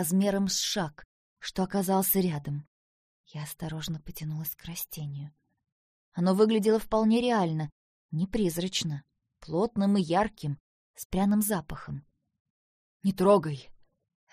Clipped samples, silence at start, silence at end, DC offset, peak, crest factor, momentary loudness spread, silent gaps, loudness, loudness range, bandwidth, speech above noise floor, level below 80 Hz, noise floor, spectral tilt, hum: under 0.1%; 0 s; 0.6 s; under 0.1%; -10 dBFS; 20 dB; 16 LU; 1.05-1.36 s, 2.67-3.24 s, 5.72-6.12 s, 7.72-8.09 s, 10.60-10.94 s, 11.05-11.10 s, 12.40-13.00 s; -28 LUFS; 8 LU; 15.5 kHz; over 62 dB; -54 dBFS; under -90 dBFS; -5.5 dB/octave; none